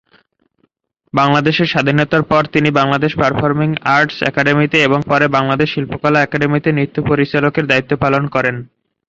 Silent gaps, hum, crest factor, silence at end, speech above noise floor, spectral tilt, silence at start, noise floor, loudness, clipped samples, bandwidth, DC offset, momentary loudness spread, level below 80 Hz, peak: none; none; 14 dB; 0.45 s; 48 dB; -6.5 dB/octave; 1.15 s; -62 dBFS; -14 LUFS; under 0.1%; 7.6 kHz; under 0.1%; 4 LU; -46 dBFS; 0 dBFS